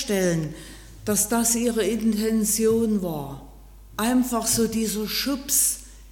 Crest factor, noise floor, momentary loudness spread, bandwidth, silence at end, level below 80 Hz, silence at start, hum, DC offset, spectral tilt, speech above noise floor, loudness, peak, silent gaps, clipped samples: 18 dB; -45 dBFS; 14 LU; 17.5 kHz; 0 s; -46 dBFS; 0 s; none; under 0.1%; -3.5 dB/octave; 22 dB; -22 LUFS; -6 dBFS; none; under 0.1%